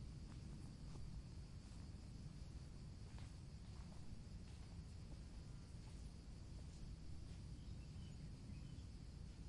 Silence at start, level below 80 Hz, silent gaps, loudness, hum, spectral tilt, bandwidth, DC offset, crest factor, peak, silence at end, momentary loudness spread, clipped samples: 0 s; -58 dBFS; none; -57 LUFS; none; -6 dB/octave; 11 kHz; under 0.1%; 12 dB; -42 dBFS; 0 s; 2 LU; under 0.1%